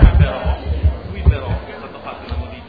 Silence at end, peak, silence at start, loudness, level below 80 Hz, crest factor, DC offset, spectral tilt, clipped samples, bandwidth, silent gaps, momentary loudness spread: 0 s; 0 dBFS; 0 s; -19 LUFS; -18 dBFS; 16 dB; 0.4%; -10.5 dB/octave; 0.3%; 4.9 kHz; none; 14 LU